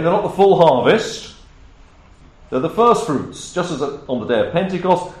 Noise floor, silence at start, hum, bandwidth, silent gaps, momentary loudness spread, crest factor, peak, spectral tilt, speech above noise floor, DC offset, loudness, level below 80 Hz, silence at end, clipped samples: -45 dBFS; 0 s; none; 13 kHz; none; 13 LU; 16 dB; -2 dBFS; -5.5 dB/octave; 29 dB; under 0.1%; -17 LUFS; -48 dBFS; 0 s; under 0.1%